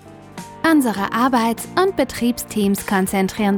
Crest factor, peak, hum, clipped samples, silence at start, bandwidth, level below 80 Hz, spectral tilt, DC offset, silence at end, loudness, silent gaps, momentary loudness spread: 16 dB; -4 dBFS; none; under 0.1%; 0.05 s; over 20 kHz; -48 dBFS; -5 dB/octave; under 0.1%; 0 s; -19 LUFS; none; 5 LU